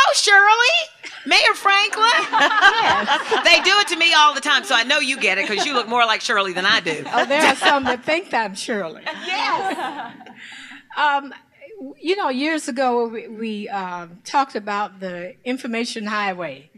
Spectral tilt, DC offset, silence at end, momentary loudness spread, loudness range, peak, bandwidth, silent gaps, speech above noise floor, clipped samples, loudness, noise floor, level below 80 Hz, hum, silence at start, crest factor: -1.5 dB/octave; under 0.1%; 0.15 s; 17 LU; 10 LU; -2 dBFS; 15 kHz; none; 20 dB; under 0.1%; -17 LUFS; -39 dBFS; -62 dBFS; none; 0 s; 18 dB